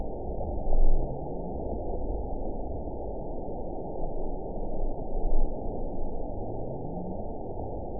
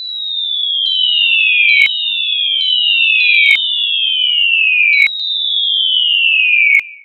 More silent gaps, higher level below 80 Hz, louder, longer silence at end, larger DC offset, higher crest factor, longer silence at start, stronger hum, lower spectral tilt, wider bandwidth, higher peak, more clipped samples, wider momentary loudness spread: neither; first, -30 dBFS vs -76 dBFS; second, -36 LUFS vs -10 LUFS; about the same, 0 s vs 0.05 s; first, 1% vs under 0.1%; about the same, 16 dB vs 12 dB; about the same, 0 s vs 0 s; neither; first, -15.5 dB/octave vs 4.5 dB/octave; second, 1 kHz vs 15 kHz; second, -10 dBFS vs 0 dBFS; neither; about the same, 5 LU vs 6 LU